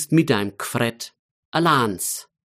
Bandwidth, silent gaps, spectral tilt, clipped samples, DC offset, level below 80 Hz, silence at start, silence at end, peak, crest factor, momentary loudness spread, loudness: 15.5 kHz; 1.19-1.52 s; -4.5 dB/octave; under 0.1%; under 0.1%; -64 dBFS; 0 s; 0.35 s; -4 dBFS; 18 dB; 13 LU; -22 LUFS